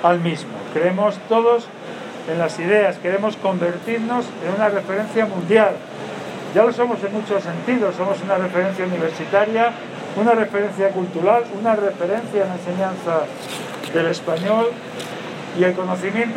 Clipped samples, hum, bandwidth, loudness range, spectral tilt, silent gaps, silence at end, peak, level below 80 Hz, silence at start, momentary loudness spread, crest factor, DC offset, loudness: under 0.1%; none; 15 kHz; 3 LU; -6 dB/octave; none; 0 s; -2 dBFS; -74 dBFS; 0 s; 12 LU; 18 dB; under 0.1%; -20 LUFS